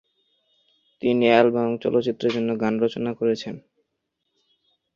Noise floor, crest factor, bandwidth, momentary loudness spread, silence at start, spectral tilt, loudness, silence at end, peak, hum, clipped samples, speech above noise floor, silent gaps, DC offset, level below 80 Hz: -78 dBFS; 22 dB; 7.2 kHz; 11 LU; 1.05 s; -6.5 dB/octave; -22 LUFS; 1.35 s; -2 dBFS; none; under 0.1%; 57 dB; none; under 0.1%; -66 dBFS